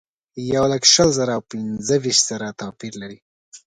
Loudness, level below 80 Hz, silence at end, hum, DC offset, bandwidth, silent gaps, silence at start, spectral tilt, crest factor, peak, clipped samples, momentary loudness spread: -17 LUFS; -52 dBFS; 0.2 s; none; under 0.1%; 11 kHz; 3.22-3.52 s; 0.35 s; -3 dB/octave; 20 dB; 0 dBFS; under 0.1%; 20 LU